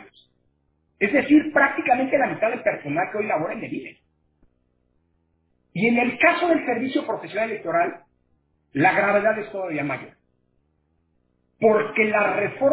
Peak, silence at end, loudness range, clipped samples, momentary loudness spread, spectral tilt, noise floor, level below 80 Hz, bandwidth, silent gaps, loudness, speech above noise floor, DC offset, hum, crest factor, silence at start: -4 dBFS; 0 s; 6 LU; under 0.1%; 11 LU; -9.5 dB/octave; -68 dBFS; -64 dBFS; 4 kHz; none; -21 LUFS; 47 dB; under 0.1%; none; 20 dB; 0 s